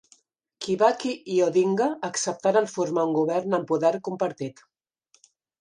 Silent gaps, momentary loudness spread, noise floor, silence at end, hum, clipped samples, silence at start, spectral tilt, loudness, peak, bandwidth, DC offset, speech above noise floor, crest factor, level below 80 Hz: none; 8 LU; -66 dBFS; 1.1 s; none; under 0.1%; 0.6 s; -5 dB/octave; -24 LUFS; -6 dBFS; 11 kHz; under 0.1%; 42 dB; 20 dB; -76 dBFS